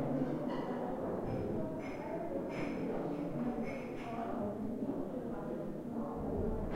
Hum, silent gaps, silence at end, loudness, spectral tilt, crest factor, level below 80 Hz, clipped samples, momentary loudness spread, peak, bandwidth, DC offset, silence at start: none; none; 0 s; -39 LUFS; -8.5 dB/octave; 16 dB; -52 dBFS; under 0.1%; 3 LU; -24 dBFS; 16 kHz; under 0.1%; 0 s